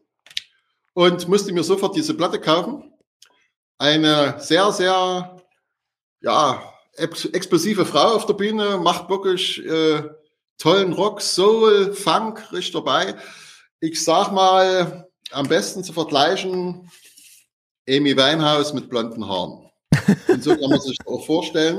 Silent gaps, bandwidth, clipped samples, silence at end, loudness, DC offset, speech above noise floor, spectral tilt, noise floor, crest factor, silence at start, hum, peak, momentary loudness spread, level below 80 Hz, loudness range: 3.07-3.20 s, 3.56-3.78 s, 6.03-6.16 s, 10.50-10.56 s, 13.71-13.79 s, 17.53-17.85 s; 15.5 kHz; under 0.1%; 0 s; -19 LUFS; under 0.1%; 56 dB; -4.5 dB/octave; -75 dBFS; 18 dB; 0.35 s; none; -2 dBFS; 13 LU; -58 dBFS; 3 LU